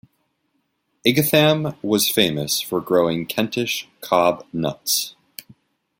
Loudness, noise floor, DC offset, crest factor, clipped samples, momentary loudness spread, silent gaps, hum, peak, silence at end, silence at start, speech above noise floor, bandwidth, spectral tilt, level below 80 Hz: -20 LUFS; -70 dBFS; under 0.1%; 20 dB; under 0.1%; 10 LU; none; none; -2 dBFS; 0.9 s; 1.05 s; 51 dB; 16.5 kHz; -4 dB/octave; -60 dBFS